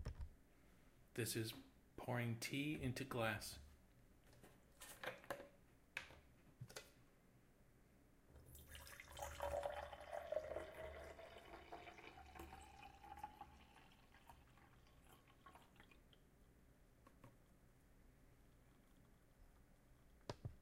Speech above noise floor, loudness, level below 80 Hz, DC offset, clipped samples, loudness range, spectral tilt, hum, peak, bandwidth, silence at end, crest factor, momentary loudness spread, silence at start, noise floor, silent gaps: 26 dB; -51 LUFS; -66 dBFS; under 0.1%; under 0.1%; 21 LU; -4.5 dB/octave; none; -28 dBFS; 16 kHz; 0 s; 26 dB; 23 LU; 0 s; -72 dBFS; none